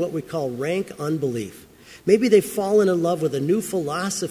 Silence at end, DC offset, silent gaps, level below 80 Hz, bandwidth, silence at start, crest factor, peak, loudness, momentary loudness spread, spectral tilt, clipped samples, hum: 0 s; under 0.1%; none; -60 dBFS; 16 kHz; 0 s; 18 dB; -4 dBFS; -22 LUFS; 9 LU; -5.5 dB/octave; under 0.1%; none